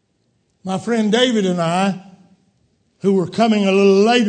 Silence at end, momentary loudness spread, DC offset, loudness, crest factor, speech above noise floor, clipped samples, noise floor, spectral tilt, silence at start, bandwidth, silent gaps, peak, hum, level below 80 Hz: 0 s; 12 LU; under 0.1%; -16 LUFS; 16 dB; 49 dB; under 0.1%; -65 dBFS; -5.5 dB/octave; 0.65 s; 9.4 kHz; none; -2 dBFS; none; -64 dBFS